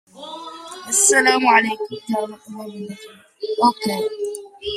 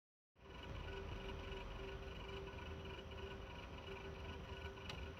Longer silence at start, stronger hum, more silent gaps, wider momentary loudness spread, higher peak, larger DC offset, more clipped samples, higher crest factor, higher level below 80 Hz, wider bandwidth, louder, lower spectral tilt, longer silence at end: second, 0.15 s vs 0.35 s; neither; neither; first, 21 LU vs 3 LU; first, -2 dBFS vs -36 dBFS; neither; neither; about the same, 20 dB vs 16 dB; second, -62 dBFS vs -56 dBFS; about the same, 15.5 kHz vs 15.5 kHz; first, -18 LUFS vs -51 LUFS; second, -1.5 dB/octave vs -5.5 dB/octave; about the same, 0 s vs 0 s